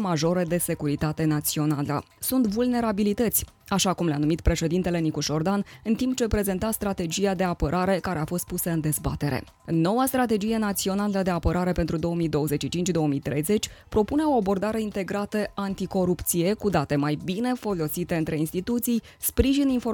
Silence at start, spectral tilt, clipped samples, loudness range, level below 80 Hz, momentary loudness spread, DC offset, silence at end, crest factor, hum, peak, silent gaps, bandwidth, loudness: 0 s; -5.5 dB/octave; under 0.1%; 1 LU; -40 dBFS; 5 LU; under 0.1%; 0 s; 18 dB; none; -6 dBFS; none; 19 kHz; -25 LUFS